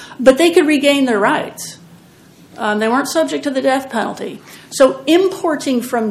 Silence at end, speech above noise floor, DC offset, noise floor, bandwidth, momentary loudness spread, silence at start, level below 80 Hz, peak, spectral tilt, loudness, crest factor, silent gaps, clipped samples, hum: 0 s; 29 dB; under 0.1%; -44 dBFS; 15.5 kHz; 16 LU; 0 s; -54 dBFS; 0 dBFS; -3.5 dB/octave; -15 LUFS; 16 dB; none; 0.2%; none